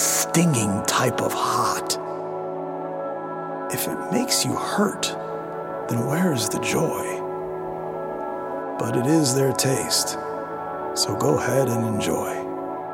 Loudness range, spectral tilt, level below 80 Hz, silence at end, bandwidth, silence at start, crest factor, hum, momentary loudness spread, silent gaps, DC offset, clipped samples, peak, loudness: 3 LU; -4 dB/octave; -58 dBFS; 0 s; 17 kHz; 0 s; 18 dB; none; 10 LU; none; under 0.1%; under 0.1%; -6 dBFS; -24 LUFS